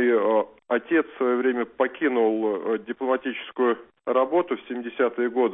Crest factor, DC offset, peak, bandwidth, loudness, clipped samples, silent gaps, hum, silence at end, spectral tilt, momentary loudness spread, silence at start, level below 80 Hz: 16 dB; under 0.1%; -8 dBFS; 3.9 kHz; -25 LUFS; under 0.1%; none; none; 0 s; -9.5 dB/octave; 6 LU; 0 s; -72 dBFS